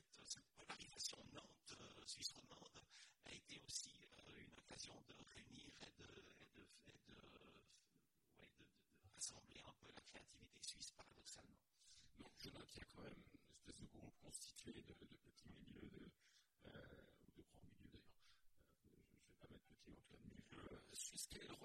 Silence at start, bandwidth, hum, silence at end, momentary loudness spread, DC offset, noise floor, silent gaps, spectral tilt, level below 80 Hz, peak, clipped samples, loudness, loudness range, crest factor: 0 s; 16 kHz; none; 0 s; 16 LU; under 0.1%; -84 dBFS; none; -2 dB/octave; -78 dBFS; -34 dBFS; under 0.1%; -59 LUFS; 11 LU; 28 dB